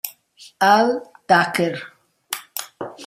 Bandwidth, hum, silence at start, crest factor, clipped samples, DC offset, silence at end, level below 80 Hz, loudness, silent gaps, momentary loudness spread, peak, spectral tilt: 16 kHz; none; 0.05 s; 20 dB; under 0.1%; under 0.1%; 0 s; -68 dBFS; -19 LUFS; none; 17 LU; -2 dBFS; -4 dB/octave